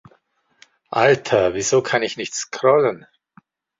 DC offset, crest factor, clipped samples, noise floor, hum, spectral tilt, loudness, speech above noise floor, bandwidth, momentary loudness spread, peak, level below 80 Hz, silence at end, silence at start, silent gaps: under 0.1%; 18 dB; under 0.1%; -61 dBFS; none; -3.5 dB/octave; -19 LUFS; 43 dB; 7.8 kHz; 10 LU; -2 dBFS; -56 dBFS; 0.85 s; 0.9 s; none